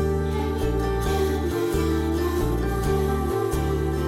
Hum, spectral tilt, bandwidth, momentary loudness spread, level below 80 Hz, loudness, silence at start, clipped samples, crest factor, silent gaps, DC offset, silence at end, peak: none; -6.5 dB/octave; 16.5 kHz; 1 LU; -30 dBFS; -24 LUFS; 0 s; under 0.1%; 12 dB; none; under 0.1%; 0 s; -12 dBFS